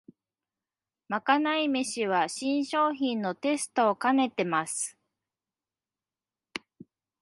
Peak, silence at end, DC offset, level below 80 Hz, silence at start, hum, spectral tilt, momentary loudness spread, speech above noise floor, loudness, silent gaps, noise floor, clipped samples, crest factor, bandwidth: -8 dBFS; 0.65 s; under 0.1%; -80 dBFS; 1.1 s; none; -3.5 dB/octave; 10 LU; over 63 dB; -28 LUFS; none; under -90 dBFS; under 0.1%; 22 dB; 11.5 kHz